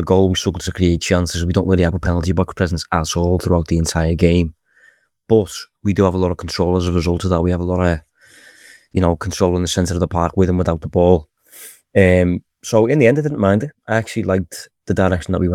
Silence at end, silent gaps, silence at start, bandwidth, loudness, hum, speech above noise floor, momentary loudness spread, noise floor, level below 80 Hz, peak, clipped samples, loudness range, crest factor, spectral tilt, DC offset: 0 s; none; 0 s; 15 kHz; -17 LUFS; none; 38 dB; 7 LU; -54 dBFS; -38 dBFS; 0 dBFS; under 0.1%; 3 LU; 16 dB; -6 dB/octave; under 0.1%